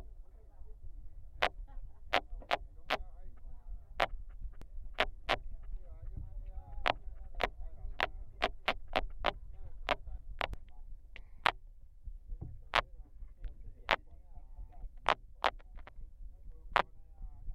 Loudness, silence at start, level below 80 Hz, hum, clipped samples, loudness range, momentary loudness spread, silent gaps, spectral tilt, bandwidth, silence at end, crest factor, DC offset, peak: -37 LUFS; 0 s; -46 dBFS; none; under 0.1%; 2 LU; 22 LU; none; -4 dB/octave; 15 kHz; 0 s; 32 dB; under 0.1%; -6 dBFS